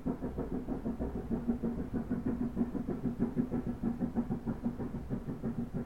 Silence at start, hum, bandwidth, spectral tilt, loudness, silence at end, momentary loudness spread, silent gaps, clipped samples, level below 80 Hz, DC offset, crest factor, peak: 0 s; none; 7.2 kHz; -10 dB/octave; -37 LUFS; 0 s; 4 LU; none; under 0.1%; -46 dBFS; 0.3%; 18 dB; -18 dBFS